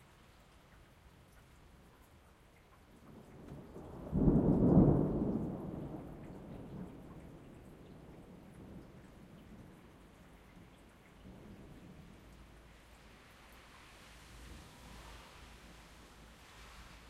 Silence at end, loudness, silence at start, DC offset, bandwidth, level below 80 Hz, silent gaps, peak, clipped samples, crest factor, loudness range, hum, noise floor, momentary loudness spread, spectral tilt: 0.1 s; -34 LUFS; 3.1 s; under 0.1%; 14 kHz; -52 dBFS; none; -14 dBFS; under 0.1%; 26 dB; 24 LU; none; -63 dBFS; 29 LU; -9 dB/octave